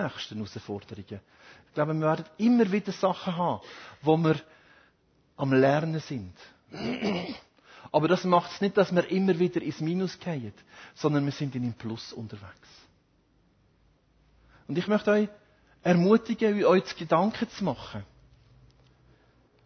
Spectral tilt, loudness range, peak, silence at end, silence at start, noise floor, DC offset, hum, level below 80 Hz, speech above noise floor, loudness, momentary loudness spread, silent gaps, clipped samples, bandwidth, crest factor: -7 dB/octave; 8 LU; -8 dBFS; 1.6 s; 0 s; -66 dBFS; under 0.1%; none; -62 dBFS; 39 dB; -27 LUFS; 17 LU; none; under 0.1%; 6.6 kHz; 20 dB